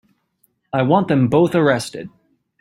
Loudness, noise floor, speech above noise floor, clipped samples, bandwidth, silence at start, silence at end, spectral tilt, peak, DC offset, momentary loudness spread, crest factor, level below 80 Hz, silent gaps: -17 LUFS; -65 dBFS; 49 dB; under 0.1%; 15.5 kHz; 0.75 s; 0.5 s; -7 dB/octave; -2 dBFS; under 0.1%; 17 LU; 16 dB; -56 dBFS; none